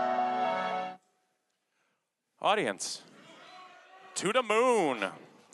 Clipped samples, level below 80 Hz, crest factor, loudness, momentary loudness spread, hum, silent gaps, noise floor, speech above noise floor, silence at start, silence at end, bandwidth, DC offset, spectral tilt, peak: under 0.1%; -88 dBFS; 20 dB; -30 LUFS; 16 LU; none; none; -80 dBFS; 51 dB; 0 s; 0.3 s; 12 kHz; under 0.1%; -3 dB/octave; -14 dBFS